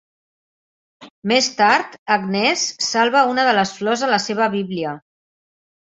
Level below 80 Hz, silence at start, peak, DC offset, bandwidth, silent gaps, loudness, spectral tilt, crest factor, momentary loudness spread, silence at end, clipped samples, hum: -66 dBFS; 1 s; -2 dBFS; under 0.1%; 8 kHz; 1.10-1.22 s, 1.98-2.06 s; -18 LUFS; -3 dB/octave; 18 dB; 10 LU; 1 s; under 0.1%; none